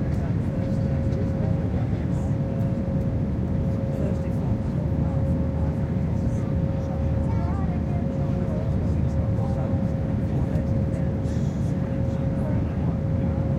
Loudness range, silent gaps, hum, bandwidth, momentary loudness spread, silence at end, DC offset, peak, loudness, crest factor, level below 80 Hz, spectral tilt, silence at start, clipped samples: 0 LU; none; none; 8.4 kHz; 1 LU; 0 s; under 0.1%; -12 dBFS; -25 LUFS; 12 dB; -32 dBFS; -10 dB/octave; 0 s; under 0.1%